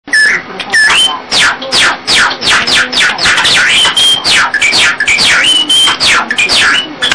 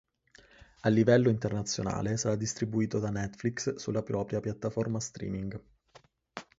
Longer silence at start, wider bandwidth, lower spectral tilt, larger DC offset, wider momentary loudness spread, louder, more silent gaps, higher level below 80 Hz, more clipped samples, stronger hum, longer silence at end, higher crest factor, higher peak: second, 0.05 s vs 0.85 s; first, 10.5 kHz vs 8 kHz; second, 0.5 dB/octave vs -5.5 dB/octave; first, 0.5% vs under 0.1%; second, 3 LU vs 12 LU; first, -6 LUFS vs -31 LUFS; neither; first, -40 dBFS vs -58 dBFS; neither; neither; second, 0 s vs 0.15 s; second, 8 dB vs 20 dB; first, 0 dBFS vs -12 dBFS